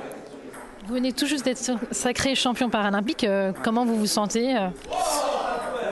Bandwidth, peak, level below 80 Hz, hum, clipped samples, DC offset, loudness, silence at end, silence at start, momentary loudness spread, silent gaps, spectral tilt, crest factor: 12.5 kHz; -10 dBFS; -54 dBFS; none; under 0.1%; under 0.1%; -24 LUFS; 0 s; 0 s; 12 LU; none; -3.5 dB/octave; 16 dB